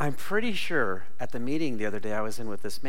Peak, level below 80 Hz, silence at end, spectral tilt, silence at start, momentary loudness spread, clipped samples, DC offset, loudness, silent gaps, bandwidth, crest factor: -12 dBFS; -58 dBFS; 0 s; -5 dB/octave; 0 s; 9 LU; under 0.1%; 7%; -31 LUFS; none; 16.5 kHz; 18 dB